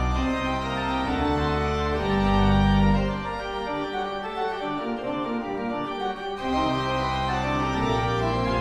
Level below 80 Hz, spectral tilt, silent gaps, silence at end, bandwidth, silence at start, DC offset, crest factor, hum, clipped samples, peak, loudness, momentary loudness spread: -34 dBFS; -6.5 dB/octave; none; 0 s; 10.5 kHz; 0 s; under 0.1%; 16 dB; none; under 0.1%; -8 dBFS; -25 LUFS; 9 LU